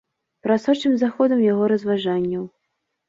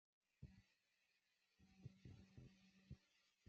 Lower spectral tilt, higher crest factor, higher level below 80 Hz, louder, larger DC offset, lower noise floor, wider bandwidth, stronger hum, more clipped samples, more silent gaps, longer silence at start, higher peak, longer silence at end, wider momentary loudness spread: about the same, -7 dB/octave vs -7 dB/octave; second, 14 dB vs 22 dB; first, -66 dBFS vs -80 dBFS; first, -20 LUFS vs -66 LUFS; neither; second, -76 dBFS vs -87 dBFS; first, 7.8 kHz vs 7 kHz; neither; neither; neither; about the same, 0.45 s vs 0.35 s; first, -6 dBFS vs -46 dBFS; first, 0.6 s vs 0 s; first, 11 LU vs 4 LU